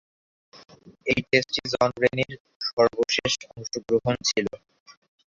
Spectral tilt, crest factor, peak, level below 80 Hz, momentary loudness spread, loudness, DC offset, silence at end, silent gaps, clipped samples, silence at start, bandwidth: -3.5 dB/octave; 22 dB; -4 dBFS; -58 dBFS; 12 LU; -25 LUFS; under 0.1%; 0.4 s; 2.40-2.45 s, 2.56-2.60 s, 2.73-2.77 s, 4.80-4.86 s; under 0.1%; 0.55 s; 7.8 kHz